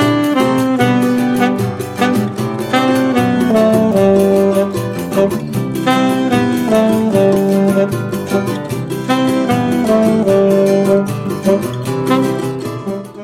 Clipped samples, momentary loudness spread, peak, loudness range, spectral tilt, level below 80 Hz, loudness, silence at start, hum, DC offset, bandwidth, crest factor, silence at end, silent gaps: under 0.1%; 8 LU; 0 dBFS; 1 LU; -6.5 dB/octave; -48 dBFS; -14 LUFS; 0 s; none; under 0.1%; 16.5 kHz; 12 dB; 0 s; none